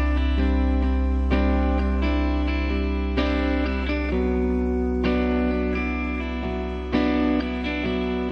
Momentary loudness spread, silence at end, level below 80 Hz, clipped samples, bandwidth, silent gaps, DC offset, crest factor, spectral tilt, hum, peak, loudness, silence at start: 4 LU; 0 s; -26 dBFS; under 0.1%; 6 kHz; none; under 0.1%; 14 dB; -8.5 dB/octave; none; -10 dBFS; -24 LUFS; 0 s